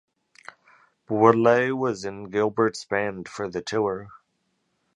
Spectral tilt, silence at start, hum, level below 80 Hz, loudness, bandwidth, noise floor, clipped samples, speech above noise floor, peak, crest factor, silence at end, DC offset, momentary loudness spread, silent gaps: -6 dB/octave; 1.1 s; none; -64 dBFS; -24 LUFS; 11 kHz; -73 dBFS; under 0.1%; 50 dB; -2 dBFS; 24 dB; 0.8 s; under 0.1%; 13 LU; none